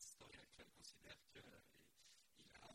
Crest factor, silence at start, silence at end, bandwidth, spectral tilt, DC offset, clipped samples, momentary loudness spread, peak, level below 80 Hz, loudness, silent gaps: 20 dB; 0 s; 0 s; 16 kHz; -2 dB/octave; under 0.1%; under 0.1%; 8 LU; -46 dBFS; -82 dBFS; -64 LUFS; none